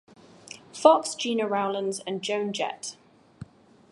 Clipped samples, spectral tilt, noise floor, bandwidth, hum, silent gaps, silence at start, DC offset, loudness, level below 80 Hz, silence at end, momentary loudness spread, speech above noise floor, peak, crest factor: under 0.1%; -3.5 dB/octave; -48 dBFS; 11.5 kHz; none; none; 0.5 s; under 0.1%; -26 LUFS; -68 dBFS; 0.45 s; 27 LU; 22 dB; -2 dBFS; 24 dB